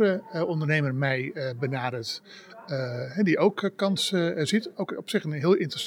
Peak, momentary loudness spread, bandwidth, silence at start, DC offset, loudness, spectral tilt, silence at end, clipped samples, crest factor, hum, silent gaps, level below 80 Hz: -8 dBFS; 10 LU; 17 kHz; 0 s; under 0.1%; -27 LUFS; -5.5 dB/octave; 0 s; under 0.1%; 18 dB; none; none; -82 dBFS